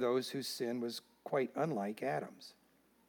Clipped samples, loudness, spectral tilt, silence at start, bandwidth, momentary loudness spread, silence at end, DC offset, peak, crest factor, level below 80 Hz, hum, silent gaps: under 0.1%; -39 LUFS; -5 dB/octave; 0 s; 19 kHz; 13 LU; 0.55 s; under 0.1%; -22 dBFS; 16 dB; -90 dBFS; none; none